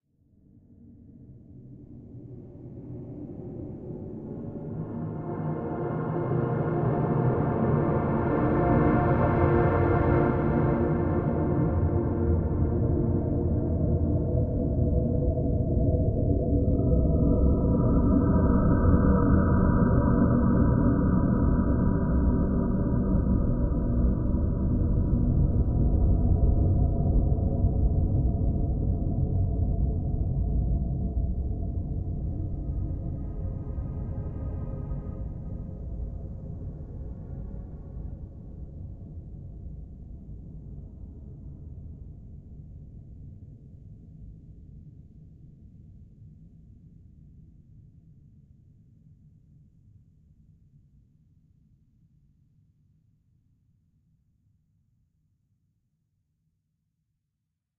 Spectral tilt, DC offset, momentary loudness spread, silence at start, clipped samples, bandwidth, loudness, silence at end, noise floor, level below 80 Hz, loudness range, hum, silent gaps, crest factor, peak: -11.5 dB/octave; under 0.1%; 21 LU; 1.1 s; under 0.1%; 3 kHz; -26 LUFS; 10 s; -82 dBFS; -32 dBFS; 21 LU; none; none; 18 dB; -8 dBFS